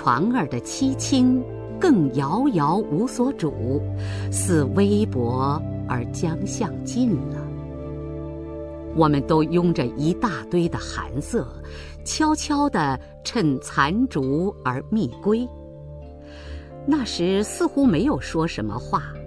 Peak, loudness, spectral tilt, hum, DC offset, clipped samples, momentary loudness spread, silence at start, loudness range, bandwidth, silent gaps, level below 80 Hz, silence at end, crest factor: -4 dBFS; -23 LUFS; -6 dB/octave; none; under 0.1%; under 0.1%; 14 LU; 0 s; 4 LU; 11 kHz; none; -42 dBFS; 0 s; 18 dB